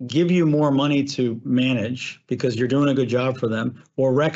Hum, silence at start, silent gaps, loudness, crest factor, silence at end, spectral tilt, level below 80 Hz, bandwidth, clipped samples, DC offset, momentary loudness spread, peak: none; 0 s; none; -21 LUFS; 12 dB; 0 s; -7 dB/octave; -66 dBFS; 8 kHz; under 0.1%; under 0.1%; 8 LU; -8 dBFS